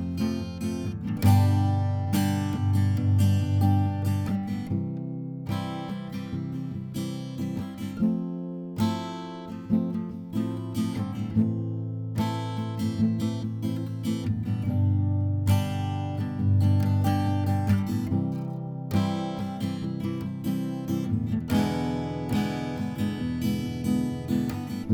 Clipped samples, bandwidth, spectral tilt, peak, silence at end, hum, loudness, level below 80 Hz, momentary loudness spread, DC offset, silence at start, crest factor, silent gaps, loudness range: under 0.1%; 18.5 kHz; -7.5 dB/octave; -8 dBFS; 0 s; none; -28 LUFS; -54 dBFS; 10 LU; under 0.1%; 0 s; 18 dB; none; 6 LU